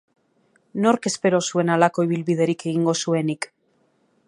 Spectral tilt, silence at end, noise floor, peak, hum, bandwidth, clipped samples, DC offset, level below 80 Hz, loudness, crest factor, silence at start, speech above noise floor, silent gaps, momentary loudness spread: -5 dB/octave; 0.8 s; -65 dBFS; -2 dBFS; none; 11.5 kHz; under 0.1%; under 0.1%; -70 dBFS; -21 LUFS; 20 dB; 0.75 s; 44 dB; none; 8 LU